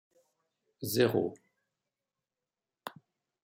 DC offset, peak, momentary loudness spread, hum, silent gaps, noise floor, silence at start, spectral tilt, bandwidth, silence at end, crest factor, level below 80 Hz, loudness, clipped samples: under 0.1%; -14 dBFS; 20 LU; none; none; under -90 dBFS; 0.8 s; -5 dB/octave; 16.5 kHz; 0.55 s; 24 dB; -78 dBFS; -31 LUFS; under 0.1%